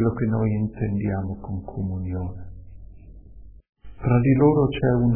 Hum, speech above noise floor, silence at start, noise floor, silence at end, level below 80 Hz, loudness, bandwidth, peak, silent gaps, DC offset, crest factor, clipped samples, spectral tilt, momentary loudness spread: none; 22 dB; 0 s; -44 dBFS; 0 s; -42 dBFS; -23 LUFS; 3.3 kHz; -4 dBFS; 3.69-3.73 s; under 0.1%; 18 dB; under 0.1%; -12.5 dB/octave; 15 LU